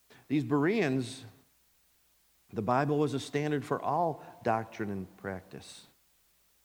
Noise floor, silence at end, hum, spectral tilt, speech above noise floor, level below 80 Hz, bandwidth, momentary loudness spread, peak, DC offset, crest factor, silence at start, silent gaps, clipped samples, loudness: -68 dBFS; 0.85 s; none; -6.5 dB/octave; 36 dB; -74 dBFS; over 20 kHz; 16 LU; -14 dBFS; under 0.1%; 20 dB; 0.3 s; none; under 0.1%; -32 LUFS